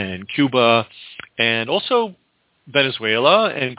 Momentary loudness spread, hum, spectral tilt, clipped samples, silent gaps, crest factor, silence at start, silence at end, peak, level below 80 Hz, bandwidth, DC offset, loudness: 14 LU; none; -8.5 dB/octave; under 0.1%; none; 18 dB; 0 s; 0.05 s; -2 dBFS; -58 dBFS; 4 kHz; under 0.1%; -17 LUFS